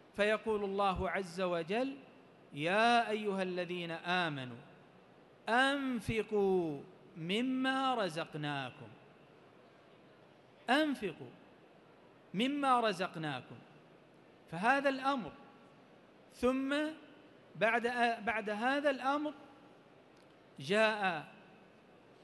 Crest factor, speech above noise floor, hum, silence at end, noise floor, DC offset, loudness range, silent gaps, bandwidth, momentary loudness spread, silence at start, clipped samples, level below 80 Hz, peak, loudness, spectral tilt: 20 dB; 27 dB; none; 0.7 s; -62 dBFS; under 0.1%; 5 LU; none; 12 kHz; 17 LU; 0.15 s; under 0.1%; -64 dBFS; -16 dBFS; -34 LUFS; -5 dB/octave